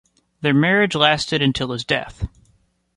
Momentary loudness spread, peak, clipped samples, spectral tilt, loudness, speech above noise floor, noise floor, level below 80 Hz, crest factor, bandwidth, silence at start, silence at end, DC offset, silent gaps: 15 LU; 0 dBFS; under 0.1%; -5 dB/octave; -18 LUFS; 42 dB; -61 dBFS; -40 dBFS; 20 dB; 11.5 kHz; 0.4 s; 0.7 s; under 0.1%; none